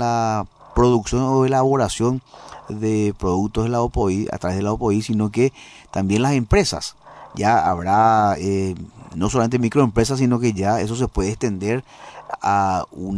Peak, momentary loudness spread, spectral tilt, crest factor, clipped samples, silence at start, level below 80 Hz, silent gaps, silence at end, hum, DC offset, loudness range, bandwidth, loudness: -4 dBFS; 11 LU; -6 dB/octave; 16 dB; under 0.1%; 0 s; -36 dBFS; none; 0 s; none; under 0.1%; 3 LU; 11 kHz; -20 LUFS